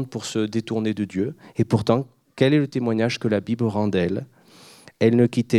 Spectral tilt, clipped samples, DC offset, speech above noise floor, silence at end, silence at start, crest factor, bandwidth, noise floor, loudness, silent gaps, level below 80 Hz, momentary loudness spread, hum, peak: -7 dB/octave; under 0.1%; under 0.1%; 28 dB; 0 s; 0 s; 20 dB; 12.5 kHz; -49 dBFS; -23 LUFS; none; -60 dBFS; 8 LU; none; -2 dBFS